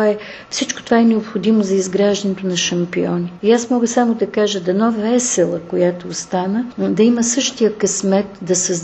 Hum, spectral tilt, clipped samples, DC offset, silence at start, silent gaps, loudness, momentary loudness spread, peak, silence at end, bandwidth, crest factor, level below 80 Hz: none; -4 dB/octave; under 0.1%; under 0.1%; 0 s; none; -17 LUFS; 6 LU; 0 dBFS; 0 s; 8.6 kHz; 16 dB; -56 dBFS